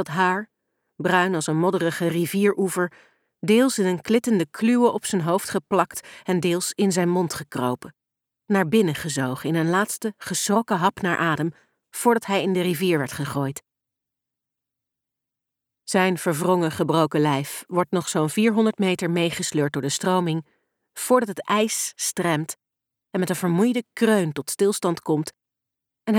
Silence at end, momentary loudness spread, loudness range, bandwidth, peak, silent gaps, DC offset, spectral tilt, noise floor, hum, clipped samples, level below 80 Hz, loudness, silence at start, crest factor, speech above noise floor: 0 s; 8 LU; 3 LU; 18.5 kHz; -4 dBFS; none; under 0.1%; -5 dB/octave; -85 dBFS; none; under 0.1%; -66 dBFS; -23 LUFS; 0 s; 20 dB; 63 dB